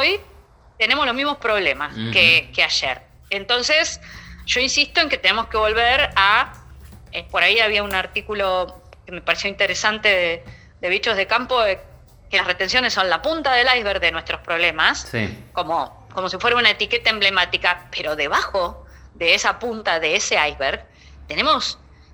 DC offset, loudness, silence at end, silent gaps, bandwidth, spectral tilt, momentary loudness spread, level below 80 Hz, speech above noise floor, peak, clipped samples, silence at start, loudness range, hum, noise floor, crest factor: under 0.1%; -18 LUFS; 0.4 s; none; over 20 kHz; -2 dB/octave; 12 LU; -44 dBFS; 29 dB; 0 dBFS; under 0.1%; 0 s; 3 LU; none; -49 dBFS; 20 dB